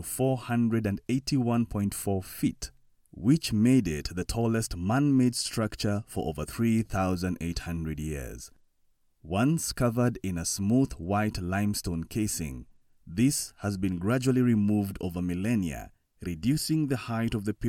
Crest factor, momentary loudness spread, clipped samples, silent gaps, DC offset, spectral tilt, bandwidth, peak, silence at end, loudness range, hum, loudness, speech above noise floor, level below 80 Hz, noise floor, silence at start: 16 dB; 10 LU; under 0.1%; none; under 0.1%; -5.5 dB/octave; 17 kHz; -12 dBFS; 0 s; 4 LU; none; -28 LUFS; 40 dB; -48 dBFS; -67 dBFS; 0 s